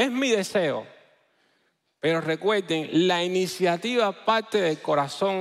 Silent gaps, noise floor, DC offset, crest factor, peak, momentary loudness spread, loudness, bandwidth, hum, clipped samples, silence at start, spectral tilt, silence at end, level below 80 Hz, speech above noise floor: none; -70 dBFS; under 0.1%; 16 dB; -10 dBFS; 4 LU; -24 LUFS; 15.5 kHz; none; under 0.1%; 0 s; -4.5 dB/octave; 0 s; -76 dBFS; 46 dB